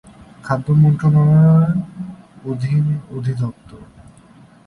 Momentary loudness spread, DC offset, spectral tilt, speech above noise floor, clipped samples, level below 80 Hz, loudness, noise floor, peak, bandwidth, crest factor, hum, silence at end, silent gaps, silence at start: 20 LU; under 0.1%; -10 dB/octave; 31 dB; under 0.1%; -46 dBFS; -16 LUFS; -46 dBFS; -2 dBFS; 5.4 kHz; 14 dB; none; 0.85 s; none; 0.45 s